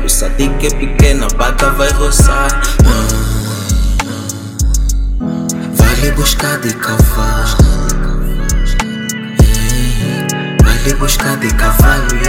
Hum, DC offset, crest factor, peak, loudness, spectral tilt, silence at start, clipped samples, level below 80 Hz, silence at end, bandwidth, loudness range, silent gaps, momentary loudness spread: none; under 0.1%; 10 dB; 0 dBFS; -13 LUFS; -4.5 dB/octave; 0 s; 0.9%; -12 dBFS; 0 s; 17 kHz; 3 LU; none; 7 LU